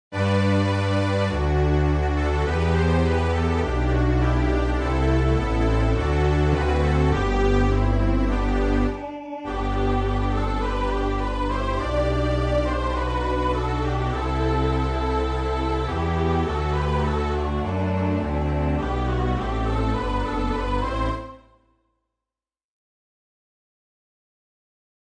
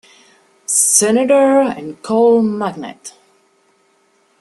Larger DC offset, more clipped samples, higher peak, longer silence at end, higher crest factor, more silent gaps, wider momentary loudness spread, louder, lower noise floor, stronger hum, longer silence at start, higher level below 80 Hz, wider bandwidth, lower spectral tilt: neither; neither; second, -8 dBFS vs 0 dBFS; first, 3.65 s vs 1.3 s; about the same, 14 dB vs 16 dB; neither; second, 5 LU vs 20 LU; second, -23 LUFS vs -13 LUFS; first, under -90 dBFS vs -57 dBFS; neither; second, 0.1 s vs 0.7 s; first, -26 dBFS vs -62 dBFS; second, 9.8 kHz vs 13 kHz; first, -7.5 dB/octave vs -3 dB/octave